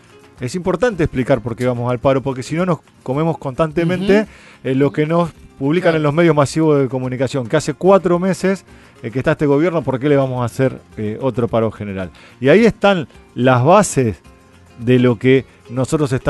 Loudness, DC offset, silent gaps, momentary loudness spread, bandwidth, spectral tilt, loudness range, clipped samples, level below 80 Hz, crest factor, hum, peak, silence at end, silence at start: -16 LUFS; under 0.1%; none; 13 LU; 12 kHz; -6.5 dB/octave; 3 LU; under 0.1%; -44 dBFS; 16 dB; none; 0 dBFS; 0 s; 0.4 s